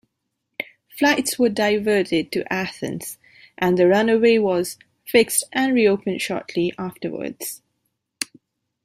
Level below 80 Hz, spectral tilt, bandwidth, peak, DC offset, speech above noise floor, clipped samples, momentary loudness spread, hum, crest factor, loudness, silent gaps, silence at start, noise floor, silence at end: -62 dBFS; -4 dB/octave; 16 kHz; -4 dBFS; under 0.1%; 57 dB; under 0.1%; 16 LU; none; 18 dB; -20 LUFS; none; 0.6 s; -77 dBFS; 0.6 s